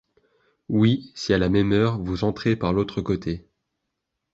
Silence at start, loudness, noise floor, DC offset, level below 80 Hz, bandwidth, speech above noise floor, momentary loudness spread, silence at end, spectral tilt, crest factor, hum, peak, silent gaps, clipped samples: 0.7 s; -23 LUFS; -80 dBFS; under 0.1%; -44 dBFS; 7.8 kHz; 58 dB; 7 LU; 0.95 s; -7 dB/octave; 18 dB; none; -6 dBFS; none; under 0.1%